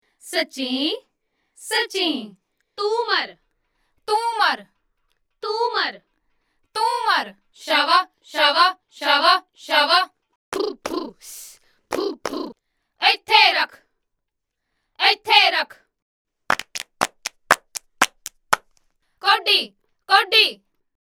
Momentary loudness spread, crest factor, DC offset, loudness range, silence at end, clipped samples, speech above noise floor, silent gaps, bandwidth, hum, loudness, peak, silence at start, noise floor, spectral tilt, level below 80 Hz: 17 LU; 22 dB; under 0.1%; 6 LU; 0.5 s; under 0.1%; 59 dB; 10.36-10.52 s, 16.02-16.25 s; over 20 kHz; none; -19 LUFS; 0 dBFS; 0.25 s; -79 dBFS; -0.5 dB/octave; -64 dBFS